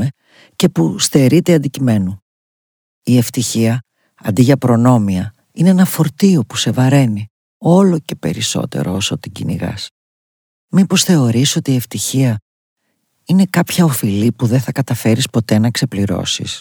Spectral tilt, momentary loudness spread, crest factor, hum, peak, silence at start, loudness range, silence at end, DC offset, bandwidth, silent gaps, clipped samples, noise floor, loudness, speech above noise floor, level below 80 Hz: -5.5 dB/octave; 11 LU; 14 dB; none; 0 dBFS; 0 s; 3 LU; 0 s; under 0.1%; over 20 kHz; 2.22-3.02 s, 7.30-7.60 s, 9.91-10.68 s, 12.42-12.76 s; under 0.1%; -66 dBFS; -14 LUFS; 53 dB; -54 dBFS